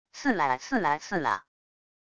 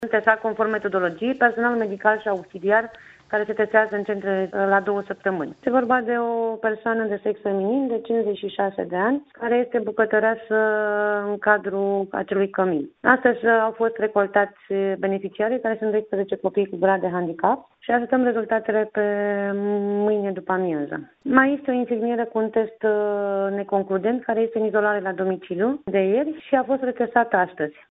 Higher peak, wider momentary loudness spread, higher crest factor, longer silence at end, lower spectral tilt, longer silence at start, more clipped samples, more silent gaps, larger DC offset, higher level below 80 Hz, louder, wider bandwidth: second, -12 dBFS vs -2 dBFS; about the same, 4 LU vs 6 LU; about the same, 18 dB vs 20 dB; first, 0.7 s vs 0.2 s; about the same, -4.5 dB/octave vs -4.5 dB/octave; about the same, 0.05 s vs 0 s; neither; neither; neither; about the same, -64 dBFS vs -66 dBFS; second, -28 LUFS vs -22 LUFS; first, 9.6 kHz vs 4 kHz